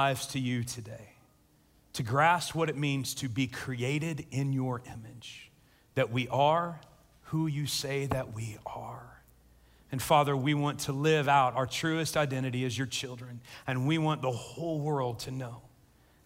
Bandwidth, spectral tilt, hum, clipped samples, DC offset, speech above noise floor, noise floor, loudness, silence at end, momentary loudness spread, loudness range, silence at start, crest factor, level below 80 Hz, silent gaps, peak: 16 kHz; -5 dB/octave; none; under 0.1%; under 0.1%; 34 dB; -65 dBFS; -31 LUFS; 0.6 s; 18 LU; 6 LU; 0 s; 20 dB; -62 dBFS; none; -10 dBFS